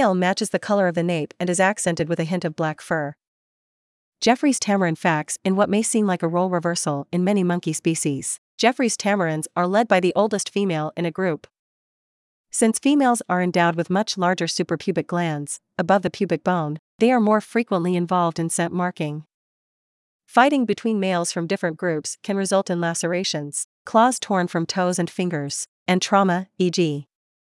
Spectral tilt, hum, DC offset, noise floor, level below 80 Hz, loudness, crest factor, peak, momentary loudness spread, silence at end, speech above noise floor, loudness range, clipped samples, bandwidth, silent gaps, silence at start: -4.5 dB/octave; none; under 0.1%; under -90 dBFS; -68 dBFS; -22 LUFS; 20 dB; -2 dBFS; 8 LU; 0.4 s; over 69 dB; 2 LU; under 0.1%; 12 kHz; 3.27-4.12 s, 8.38-8.58 s, 11.59-12.44 s, 16.79-16.99 s, 19.34-20.19 s, 23.64-23.85 s, 25.68-25.86 s; 0 s